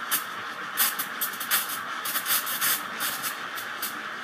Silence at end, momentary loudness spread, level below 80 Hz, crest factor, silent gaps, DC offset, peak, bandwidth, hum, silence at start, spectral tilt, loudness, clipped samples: 0 s; 8 LU; -82 dBFS; 20 dB; none; under 0.1%; -10 dBFS; 15.5 kHz; none; 0 s; 1 dB/octave; -27 LUFS; under 0.1%